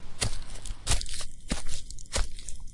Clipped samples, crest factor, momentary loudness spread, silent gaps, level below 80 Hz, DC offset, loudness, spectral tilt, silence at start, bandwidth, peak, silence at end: under 0.1%; 20 dB; 11 LU; none; -34 dBFS; under 0.1%; -34 LUFS; -2.5 dB/octave; 0 s; 11.5 kHz; -6 dBFS; 0 s